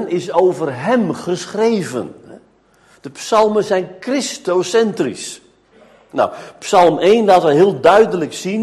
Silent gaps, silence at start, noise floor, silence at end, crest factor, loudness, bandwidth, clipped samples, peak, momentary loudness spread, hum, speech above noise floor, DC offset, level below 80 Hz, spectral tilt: none; 0 s; -52 dBFS; 0 s; 16 dB; -15 LUFS; 12.5 kHz; under 0.1%; 0 dBFS; 16 LU; none; 37 dB; under 0.1%; -56 dBFS; -5 dB/octave